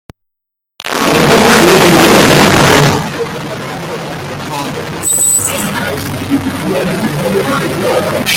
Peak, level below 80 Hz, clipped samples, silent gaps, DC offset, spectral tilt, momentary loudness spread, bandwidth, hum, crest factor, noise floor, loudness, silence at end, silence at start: 0 dBFS; -38 dBFS; 0.2%; none; under 0.1%; -3.5 dB/octave; 15 LU; 18.5 kHz; none; 12 dB; -77 dBFS; -10 LUFS; 0 s; 0.85 s